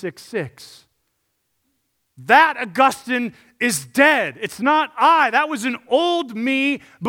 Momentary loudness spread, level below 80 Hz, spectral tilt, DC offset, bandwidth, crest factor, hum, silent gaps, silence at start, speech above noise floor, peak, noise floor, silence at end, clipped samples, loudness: 14 LU; -70 dBFS; -3 dB/octave; under 0.1%; 17.5 kHz; 20 dB; none; none; 0 s; 52 dB; 0 dBFS; -71 dBFS; 0 s; under 0.1%; -18 LUFS